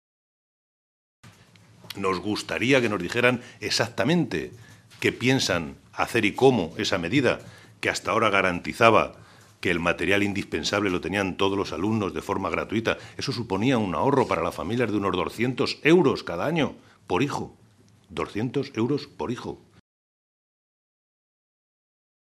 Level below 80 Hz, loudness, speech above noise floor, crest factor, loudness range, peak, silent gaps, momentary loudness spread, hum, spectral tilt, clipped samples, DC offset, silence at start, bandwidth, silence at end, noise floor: -56 dBFS; -25 LUFS; 32 dB; 26 dB; 8 LU; 0 dBFS; none; 11 LU; none; -5 dB/octave; under 0.1%; under 0.1%; 1.25 s; 14.5 kHz; 2.65 s; -57 dBFS